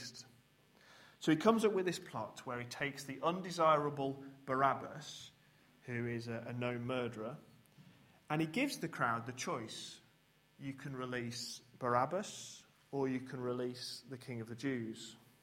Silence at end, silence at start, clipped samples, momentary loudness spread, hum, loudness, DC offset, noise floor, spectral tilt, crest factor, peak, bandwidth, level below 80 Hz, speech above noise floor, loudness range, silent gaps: 0.25 s; 0 s; under 0.1%; 17 LU; none; -39 LUFS; under 0.1%; -71 dBFS; -5 dB/octave; 24 dB; -14 dBFS; 16 kHz; -78 dBFS; 32 dB; 6 LU; none